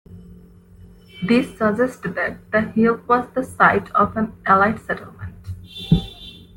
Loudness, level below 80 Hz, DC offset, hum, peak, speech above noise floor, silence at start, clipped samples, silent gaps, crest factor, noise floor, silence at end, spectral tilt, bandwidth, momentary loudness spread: -19 LUFS; -42 dBFS; under 0.1%; none; -2 dBFS; 26 dB; 0.1 s; under 0.1%; none; 20 dB; -45 dBFS; 0.2 s; -7 dB/octave; 17 kHz; 18 LU